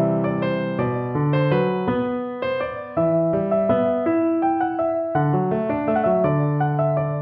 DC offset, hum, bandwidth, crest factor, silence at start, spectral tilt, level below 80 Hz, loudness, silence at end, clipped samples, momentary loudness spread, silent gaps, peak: under 0.1%; none; 4.9 kHz; 14 dB; 0 s; -11.5 dB/octave; -52 dBFS; -21 LUFS; 0 s; under 0.1%; 5 LU; none; -8 dBFS